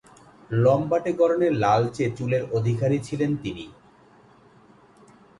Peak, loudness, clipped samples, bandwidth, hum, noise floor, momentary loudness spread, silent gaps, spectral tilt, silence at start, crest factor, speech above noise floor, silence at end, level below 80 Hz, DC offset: -8 dBFS; -23 LUFS; under 0.1%; 11.5 kHz; none; -54 dBFS; 9 LU; none; -7.5 dB/octave; 0.5 s; 18 dB; 31 dB; 1.7 s; -56 dBFS; under 0.1%